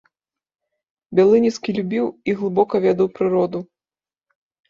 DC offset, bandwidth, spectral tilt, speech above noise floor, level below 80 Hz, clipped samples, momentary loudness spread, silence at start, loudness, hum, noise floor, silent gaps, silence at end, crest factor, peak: under 0.1%; 7.6 kHz; -7 dB/octave; over 72 dB; -62 dBFS; under 0.1%; 9 LU; 1.1 s; -19 LUFS; none; under -90 dBFS; none; 1.05 s; 18 dB; -4 dBFS